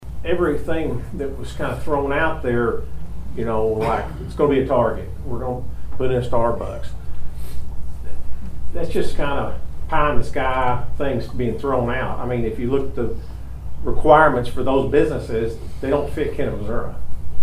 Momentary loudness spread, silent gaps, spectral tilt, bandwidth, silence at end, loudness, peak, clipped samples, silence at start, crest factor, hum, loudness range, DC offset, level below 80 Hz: 16 LU; none; -7.5 dB/octave; 11 kHz; 0 s; -22 LUFS; 0 dBFS; under 0.1%; 0 s; 18 dB; none; 7 LU; under 0.1%; -30 dBFS